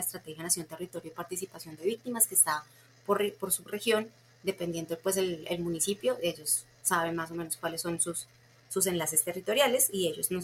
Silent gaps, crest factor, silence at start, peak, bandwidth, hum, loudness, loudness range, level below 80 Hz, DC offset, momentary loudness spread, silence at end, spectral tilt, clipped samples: none; 22 dB; 0 s; -8 dBFS; 16.5 kHz; none; -30 LUFS; 2 LU; -68 dBFS; under 0.1%; 13 LU; 0 s; -2.5 dB/octave; under 0.1%